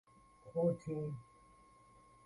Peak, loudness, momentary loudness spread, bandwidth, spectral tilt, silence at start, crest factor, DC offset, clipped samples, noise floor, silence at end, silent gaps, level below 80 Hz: -22 dBFS; -40 LUFS; 15 LU; 11 kHz; -9.5 dB/octave; 0.45 s; 20 dB; under 0.1%; under 0.1%; -64 dBFS; 1 s; none; -72 dBFS